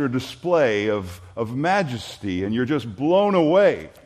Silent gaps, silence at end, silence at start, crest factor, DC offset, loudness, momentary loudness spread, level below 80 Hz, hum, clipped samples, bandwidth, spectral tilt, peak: none; 0.15 s; 0 s; 16 dB; under 0.1%; -21 LUFS; 11 LU; -58 dBFS; none; under 0.1%; 14 kHz; -6.5 dB/octave; -6 dBFS